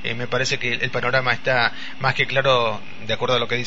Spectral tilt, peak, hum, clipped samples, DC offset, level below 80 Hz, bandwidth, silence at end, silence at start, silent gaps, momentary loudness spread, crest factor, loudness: -4 dB/octave; -4 dBFS; none; under 0.1%; 4%; -52 dBFS; 8 kHz; 0 s; 0 s; none; 6 LU; 18 dB; -21 LUFS